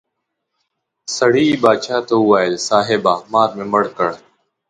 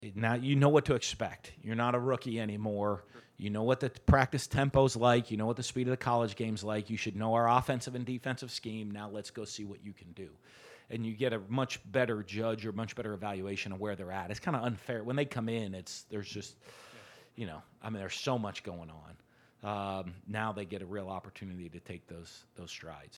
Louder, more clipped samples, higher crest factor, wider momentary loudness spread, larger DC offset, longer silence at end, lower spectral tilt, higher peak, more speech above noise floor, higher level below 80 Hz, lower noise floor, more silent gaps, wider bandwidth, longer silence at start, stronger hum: first, -16 LUFS vs -34 LUFS; neither; second, 16 dB vs 26 dB; second, 8 LU vs 19 LU; neither; first, 0.5 s vs 0 s; about the same, -4.5 dB/octave vs -5.5 dB/octave; first, 0 dBFS vs -8 dBFS; first, 60 dB vs 22 dB; second, -60 dBFS vs -54 dBFS; first, -76 dBFS vs -56 dBFS; neither; second, 10.5 kHz vs 14 kHz; first, 1.1 s vs 0 s; neither